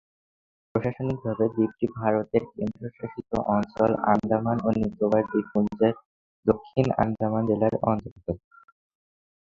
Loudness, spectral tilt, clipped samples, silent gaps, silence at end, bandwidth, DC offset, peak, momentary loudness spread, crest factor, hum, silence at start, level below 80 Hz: -26 LUFS; -9.5 dB/octave; under 0.1%; 6.05-6.43 s, 8.11-8.16 s; 1.1 s; 7.2 kHz; under 0.1%; -4 dBFS; 10 LU; 22 dB; none; 0.75 s; -52 dBFS